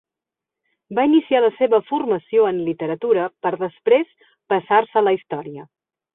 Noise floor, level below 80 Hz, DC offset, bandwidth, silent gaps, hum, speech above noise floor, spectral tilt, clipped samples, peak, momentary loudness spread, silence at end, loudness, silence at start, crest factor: -87 dBFS; -68 dBFS; under 0.1%; 4 kHz; none; none; 68 dB; -10.5 dB/octave; under 0.1%; -2 dBFS; 11 LU; 0.5 s; -19 LUFS; 0.9 s; 18 dB